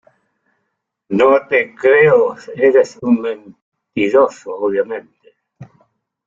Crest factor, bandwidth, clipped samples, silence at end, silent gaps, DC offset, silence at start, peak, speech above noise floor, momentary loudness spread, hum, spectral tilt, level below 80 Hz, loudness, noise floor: 16 dB; 7.6 kHz; under 0.1%; 0.65 s; 3.62-3.72 s; under 0.1%; 1.1 s; -2 dBFS; 59 dB; 13 LU; none; -6.5 dB/octave; -60 dBFS; -14 LUFS; -73 dBFS